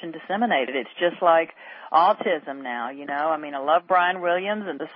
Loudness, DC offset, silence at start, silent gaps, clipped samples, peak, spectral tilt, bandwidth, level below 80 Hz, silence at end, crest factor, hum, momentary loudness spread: -23 LUFS; under 0.1%; 0 s; none; under 0.1%; -6 dBFS; -9 dB/octave; 5.4 kHz; -76 dBFS; 0 s; 18 dB; none; 11 LU